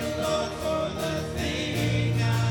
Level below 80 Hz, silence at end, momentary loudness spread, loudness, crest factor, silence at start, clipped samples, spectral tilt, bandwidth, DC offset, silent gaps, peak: -46 dBFS; 0 s; 4 LU; -27 LUFS; 12 dB; 0 s; under 0.1%; -5.5 dB/octave; 17.5 kHz; under 0.1%; none; -14 dBFS